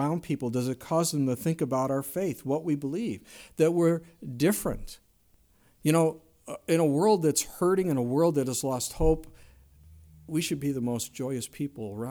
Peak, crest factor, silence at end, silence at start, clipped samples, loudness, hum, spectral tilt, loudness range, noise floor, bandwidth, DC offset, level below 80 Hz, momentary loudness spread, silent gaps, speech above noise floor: -10 dBFS; 18 dB; 0 s; 0 s; under 0.1%; -28 LUFS; none; -5.5 dB/octave; 4 LU; -63 dBFS; over 20 kHz; under 0.1%; -46 dBFS; 11 LU; none; 36 dB